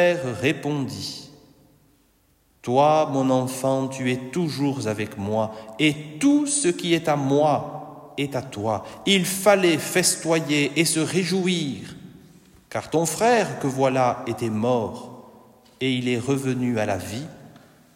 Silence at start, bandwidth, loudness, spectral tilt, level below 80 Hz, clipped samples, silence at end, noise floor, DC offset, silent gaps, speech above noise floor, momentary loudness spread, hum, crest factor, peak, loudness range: 0 s; 16 kHz; -23 LUFS; -4.5 dB/octave; -64 dBFS; under 0.1%; 0.45 s; -62 dBFS; under 0.1%; none; 40 dB; 13 LU; none; 18 dB; -4 dBFS; 4 LU